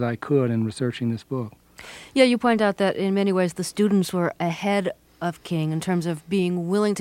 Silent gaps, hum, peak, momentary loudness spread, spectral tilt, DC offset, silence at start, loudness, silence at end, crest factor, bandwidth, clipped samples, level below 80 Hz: none; none; -4 dBFS; 11 LU; -6 dB/octave; under 0.1%; 0 s; -23 LUFS; 0 s; 20 dB; 16 kHz; under 0.1%; -62 dBFS